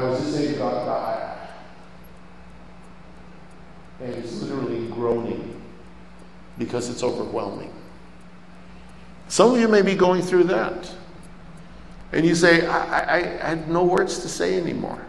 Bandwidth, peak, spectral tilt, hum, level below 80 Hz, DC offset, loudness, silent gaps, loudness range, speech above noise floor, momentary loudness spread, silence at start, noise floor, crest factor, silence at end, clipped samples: 12 kHz; -2 dBFS; -5 dB/octave; none; -50 dBFS; 0.6%; -22 LUFS; none; 13 LU; 25 dB; 23 LU; 0 s; -46 dBFS; 22 dB; 0 s; under 0.1%